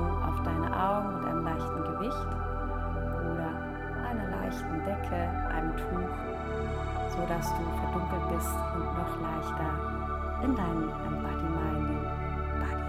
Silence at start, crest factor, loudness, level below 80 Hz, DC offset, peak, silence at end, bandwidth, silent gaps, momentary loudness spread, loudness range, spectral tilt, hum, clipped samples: 0 s; 16 dB; -33 LUFS; -38 dBFS; under 0.1%; -16 dBFS; 0 s; 15.5 kHz; none; 4 LU; 2 LU; -7 dB/octave; none; under 0.1%